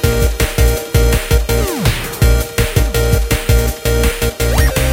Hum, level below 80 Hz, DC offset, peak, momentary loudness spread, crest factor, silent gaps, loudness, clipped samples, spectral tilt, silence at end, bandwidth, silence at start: none; -16 dBFS; under 0.1%; 0 dBFS; 3 LU; 12 dB; none; -15 LUFS; under 0.1%; -4.5 dB/octave; 0 s; 17 kHz; 0 s